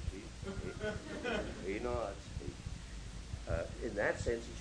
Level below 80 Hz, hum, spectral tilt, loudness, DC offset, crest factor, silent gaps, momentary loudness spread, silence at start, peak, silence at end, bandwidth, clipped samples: -48 dBFS; none; -5.5 dB/octave; -41 LUFS; under 0.1%; 20 dB; none; 11 LU; 0 s; -20 dBFS; 0 s; 10.5 kHz; under 0.1%